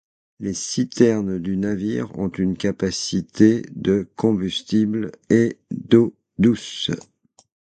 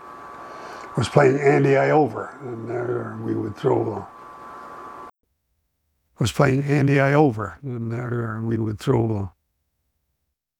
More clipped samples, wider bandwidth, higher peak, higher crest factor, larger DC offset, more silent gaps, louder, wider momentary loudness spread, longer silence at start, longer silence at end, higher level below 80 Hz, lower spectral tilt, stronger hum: neither; second, 9.2 kHz vs 13 kHz; about the same, 0 dBFS vs -2 dBFS; about the same, 20 dB vs 22 dB; neither; neither; about the same, -21 LUFS vs -21 LUFS; second, 9 LU vs 21 LU; first, 0.4 s vs 0 s; second, 0.75 s vs 1.3 s; about the same, -50 dBFS vs -54 dBFS; second, -5.5 dB/octave vs -7 dB/octave; neither